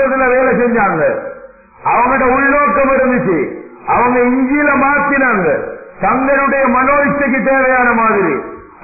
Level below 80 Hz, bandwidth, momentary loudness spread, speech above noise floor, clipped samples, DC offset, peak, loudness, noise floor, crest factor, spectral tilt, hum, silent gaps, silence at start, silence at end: -40 dBFS; 2.7 kHz; 8 LU; 25 dB; under 0.1%; under 0.1%; -2 dBFS; -12 LUFS; -37 dBFS; 10 dB; -15.5 dB/octave; none; none; 0 s; 0.15 s